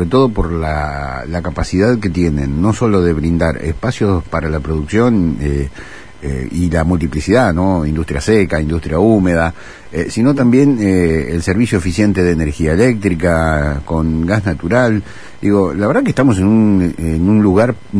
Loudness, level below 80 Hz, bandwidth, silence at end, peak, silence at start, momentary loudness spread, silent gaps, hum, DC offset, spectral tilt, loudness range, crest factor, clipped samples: -14 LUFS; -28 dBFS; 11 kHz; 0 s; 0 dBFS; 0 s; 9 LU; none; none; 2%; -7.5 dB/octave; 3 LU; 14 dB; under 0.1%